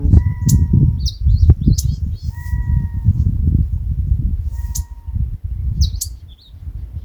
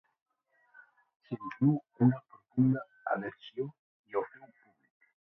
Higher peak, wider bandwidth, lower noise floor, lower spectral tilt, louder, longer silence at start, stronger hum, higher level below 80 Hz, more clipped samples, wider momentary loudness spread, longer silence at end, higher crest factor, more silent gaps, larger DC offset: first, 0 dBFS vs -14 dBFS; first, over 20 kHz vs 3.9 kHz; second, -36 dBFS vs -69 dBFS; second, -6.5 dB/octave vs -11 dB/octave; first, -18 LUFS vs -33 LUFS; second, 0 s vs 1.3 s; neither; first, -20 dBFS vs -74 dBFS; neither; about the same, 13 LU vs 13 LU; second, 0 s vs 0.95 s; about the same, 16 dB vs 20 dB; second, none vs 3.79-4.04 s; neither